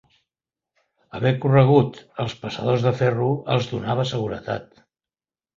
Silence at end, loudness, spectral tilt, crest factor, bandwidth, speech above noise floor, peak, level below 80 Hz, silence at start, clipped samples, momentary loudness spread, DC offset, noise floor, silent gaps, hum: 0.95 s; -22 LUFS; -7.5 dB/octave; 20 dB; 7.4 kHz; over 69 dB; -2 dBFS; -54 dBFS; 1.15 s; under 0.1%; 13 LU; under 0.1%; under -90 dBFS; none; none